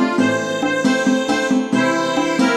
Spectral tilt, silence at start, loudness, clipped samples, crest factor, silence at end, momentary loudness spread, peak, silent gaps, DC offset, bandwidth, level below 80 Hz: -4.5 dB/octave; 0 s; -17 LUFS; under 0.1%; 14 dB; 0 s; 2 LU; -4 dBFS; none; under 0.1%; 12.5 kHz; -58 dBFS